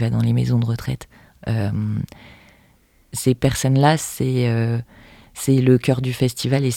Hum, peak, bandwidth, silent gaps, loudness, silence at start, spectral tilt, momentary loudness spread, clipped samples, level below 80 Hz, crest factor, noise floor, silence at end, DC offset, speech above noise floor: none; -2 dBFS; 16.5 kHz; none; -20 LUFS; 0 s; -6 dB/octave; 13 LU; under 0.1%; -46 dBFS; 18 dB; -56 dBFS; 0 s; under 0.1%; 37 dB